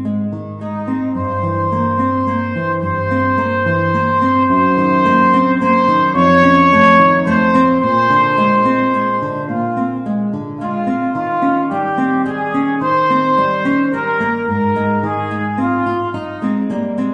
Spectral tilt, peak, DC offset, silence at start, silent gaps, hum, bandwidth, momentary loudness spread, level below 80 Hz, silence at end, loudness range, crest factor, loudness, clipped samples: -8 dB/octave; 0 dBFS; under 0.1%; 0 s; none; none; 8.2 kHz; 9 LU; -50 dBFS; 0 s; 7 LU; 14 dB; -15 LUFS; under 0.1%